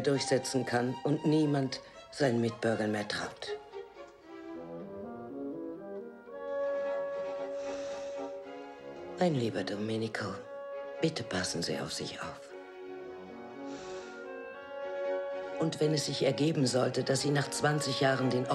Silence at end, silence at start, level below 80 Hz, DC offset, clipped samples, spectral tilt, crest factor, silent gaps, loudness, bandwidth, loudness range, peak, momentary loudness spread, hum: 0 s; 0 s; -70 dBFS; under 0.1%; under 0.1%; -5 dB/octave; 18 dB; none; -33 LUFS; 13 kHz; 10 LU; -14 dBFS; 16 LU; none